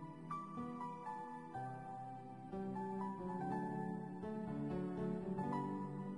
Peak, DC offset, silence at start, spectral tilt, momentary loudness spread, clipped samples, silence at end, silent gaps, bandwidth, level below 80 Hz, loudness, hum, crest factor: -30 dBFS; under 0.1%; 0 s; -9 dB/octave; 7 LU; under 0.1%; 0 s; none; 11 kHz; -72 dBFS; -45 LUFS; none; 14 dB